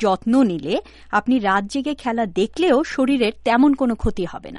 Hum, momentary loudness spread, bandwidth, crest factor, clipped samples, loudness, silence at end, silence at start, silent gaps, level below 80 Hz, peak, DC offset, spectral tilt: none; 8 LU; 11.5 kHz; 14 dB; under 0.1%; -20 LUFS; 0 s; 0 s; none; -40 dBFS; -4 dBFS; under 0.1%; -6 dB/octave